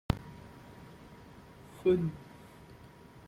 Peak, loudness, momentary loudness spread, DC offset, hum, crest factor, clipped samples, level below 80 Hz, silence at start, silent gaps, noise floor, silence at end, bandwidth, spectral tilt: -12 dBFS; -32 LUFS; 24 LU; under 0.1%; none; 26 dB; under 0.1%; -54 dBFS; 0.1 s; none; -54 dBFS; 0.05 s; 15 kHz; -8 dB/octave